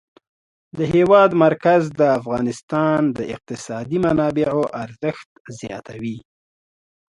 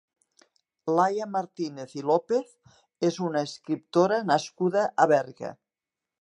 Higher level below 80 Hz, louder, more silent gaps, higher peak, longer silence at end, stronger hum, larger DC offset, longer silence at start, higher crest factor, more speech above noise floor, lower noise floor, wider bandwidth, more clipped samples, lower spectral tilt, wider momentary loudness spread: first, -52 dBFS vs -80 dBFS; first, -18 LUFS vs -26 LUFS; first, 2.63-2.68 s, 5.26-5.45 s vs none; first, 0 dBFS vs -6 dBFS; first, 1 s vs 0.65 s; neither; neither; about the same, 0.75 s vs 0.85 s; about the same, 20 dB vs 22 dB; first, over 72 dB vs 63 dB; about the same, under -90 dBFS vs -89 dBFS; about the same, 11.5 kHz vs 10.5 kHz; neither; first, -7 dB/octave vs -5.5 dB/octave; first, 18 LU vs 12 LU